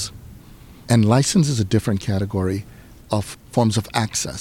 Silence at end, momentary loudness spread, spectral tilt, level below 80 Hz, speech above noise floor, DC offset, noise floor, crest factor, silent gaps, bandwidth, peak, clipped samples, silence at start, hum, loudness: 0 s; 9 LU; -5.5 dB/octave; -46 dBFS; 24 dB; under 0.1%; -43 dBFS; 16 dB; none; 16.5 kHz; -4 dBFS; under 0.1%; 0 s; none; -20 LUFS